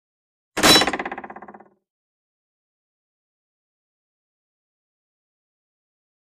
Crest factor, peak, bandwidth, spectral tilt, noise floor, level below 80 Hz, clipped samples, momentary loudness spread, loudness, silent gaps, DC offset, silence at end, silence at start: 26 dB; 0 dBFS; 14.5 kHz; -1.5 dB/octave; -45 dBFS; -52 dBFS; under 0.1%; 19 LU; -16 LUFS; none; under 0.1%; 4.8 s; 0.55 s